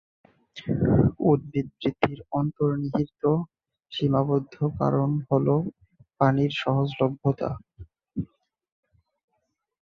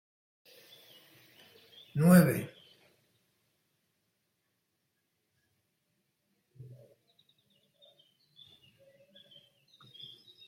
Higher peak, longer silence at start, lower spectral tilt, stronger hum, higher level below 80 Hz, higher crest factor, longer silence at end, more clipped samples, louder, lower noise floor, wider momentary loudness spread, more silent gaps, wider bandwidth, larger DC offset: first, -4 dBFS vs -10 dBFS; second, 0.55 s vs 1.95 s; first, -9 dB/octave vs -7 dB/octave; neither; first, -50 dBFS vs -72 dBFS; about the same, 22 dB vs 26 dB; second, 1.7 s vs 8 s; neither; about the same, -25 LUFS vs -26 LUFS; second, -77 dBFS vs -81 dBFS; second, 14 LU vs 31 LU; neither; second, 6.6 kHz vs 16.5 kHz; neither